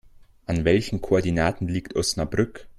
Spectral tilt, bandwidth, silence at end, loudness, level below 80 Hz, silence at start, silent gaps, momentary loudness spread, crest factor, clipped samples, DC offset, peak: -5.5 dB/octave; 14 kHz; 0.05 s; -24 LUFS; -42 dBFS; 0.2 s; none; 7 LU; 18 dB; under 0.1%; under 0.1%; -6 dBFS